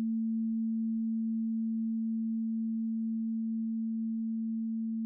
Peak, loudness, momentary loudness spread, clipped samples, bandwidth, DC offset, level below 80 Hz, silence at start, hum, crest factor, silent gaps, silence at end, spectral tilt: -28 dBFS; -33 LUFS; 2 LU; under 0.1%; 0.4 kHz; under 0.1%; -84 dBFS; 0 s; none; 4 dB; none; 0 s; -20.5 dB/octave